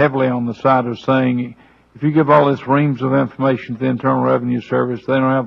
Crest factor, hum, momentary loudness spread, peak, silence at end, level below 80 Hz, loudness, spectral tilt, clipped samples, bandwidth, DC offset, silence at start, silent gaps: 16 dB; none; 7 LU; 0 dBFS; 0 s; -58 dBFS; -17 LUFS; -9 dB/octave; under 0.1%; 6.2 kHz; under 0.1%; 0 s; none